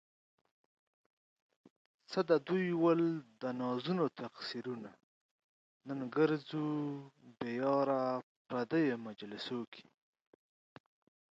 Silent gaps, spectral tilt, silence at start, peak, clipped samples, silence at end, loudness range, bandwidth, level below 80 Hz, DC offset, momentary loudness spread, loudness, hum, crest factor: 5.03-5.80 s, 8.23-8.45 s, 9.67-9.72 s; -7.5 dB/octave; 2.1 s; -16 dBFS; under 0.1%; 1.5 s; 4 LU; 7.8 kHz; -84 dBFS; under 0.1%; 13 LU; -36 LUFS; none; 20 dB